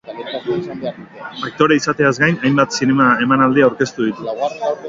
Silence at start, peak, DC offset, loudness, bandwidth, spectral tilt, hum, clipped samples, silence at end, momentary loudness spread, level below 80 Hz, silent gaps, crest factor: 0.05 s; 0 dBFS; under 0.1%; -16 LUFS; 7.6 kHz; -5.5 dB/octave; none; under 0.1%; 0 s; 14 LU; -54 dBFS; none; 16 dB